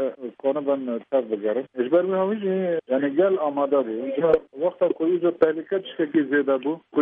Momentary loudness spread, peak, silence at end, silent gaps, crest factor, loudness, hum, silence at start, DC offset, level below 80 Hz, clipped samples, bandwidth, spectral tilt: 6 LU; -8 dBFS; 0 s; none; 16 dB; -23 LUFS; none; 0 s; under 0.1%; -66 dBFS; under 0.1%; 4.2 kHz; -9.5 dB/octave